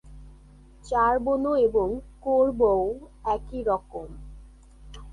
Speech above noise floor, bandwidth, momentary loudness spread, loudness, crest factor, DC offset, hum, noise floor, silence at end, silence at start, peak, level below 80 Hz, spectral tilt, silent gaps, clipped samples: 26 dB; 11 kHz; 14 LU; -25 LUFS; 16 dB; under 0.1%; none; -50 dBFS; 0 s; 0.05 s; -10 dBFS; -44 dBFS; -7.5 dB/octave; none; under 0.1%